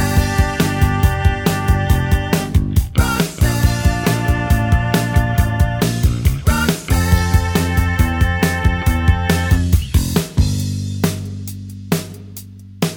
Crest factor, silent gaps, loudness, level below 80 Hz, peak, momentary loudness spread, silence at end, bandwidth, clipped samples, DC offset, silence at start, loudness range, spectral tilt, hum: 16 dB; none; -17 LUFS; -20 dBFS; 0 dBFS; 6 LU; 0 s; over 20 kHz; under 0.1%; under 0.1%; 0 s; 2 LU; -5.5 dB/octave; none